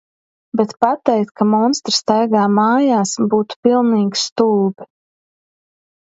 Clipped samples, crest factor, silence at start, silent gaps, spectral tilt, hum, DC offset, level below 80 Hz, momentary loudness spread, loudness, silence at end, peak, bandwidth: under 0.1%; 16 dB; 0.55 s; 3.56-3.63 s, 4.32-4.36 s; -5 dB/octave; none; under 0.1%; -64 dBFS; 5 LU; -16 LUFS; 1.2 s; 0 dBFS; 8 kHz